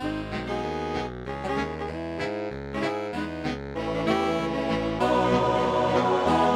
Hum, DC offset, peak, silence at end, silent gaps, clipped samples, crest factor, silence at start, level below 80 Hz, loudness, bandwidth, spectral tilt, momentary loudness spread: none; under 0.1%; -10 dBFS; 0 s; none; under 0.1%; 16 dB; 0 s; -44 dBFS; -27 LUFS; 13.5 kHz; -6 dB/octave; 9 LU